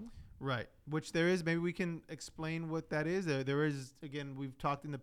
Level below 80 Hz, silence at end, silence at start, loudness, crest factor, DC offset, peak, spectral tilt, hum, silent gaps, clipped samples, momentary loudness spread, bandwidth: -64 dBFS; 0 s; 0 s; -37 LUFS; 16 dB; under 0.1%; -22 dBFS; -6 dB/octave; none; none; under 0.1%; 11 LU; 14.5 kHz